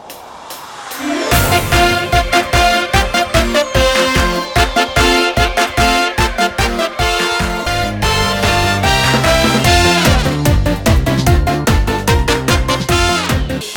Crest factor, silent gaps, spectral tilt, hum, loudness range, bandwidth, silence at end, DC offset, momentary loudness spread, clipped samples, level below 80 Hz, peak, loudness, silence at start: 12 dB; none; -4 dB/octave; none; 2 LU; 19.5 kHz; 0 s; 0.2%; 5 LU; under 0.1%; -20 dBFS; 0 dBFS; -13 LUFS; 0 s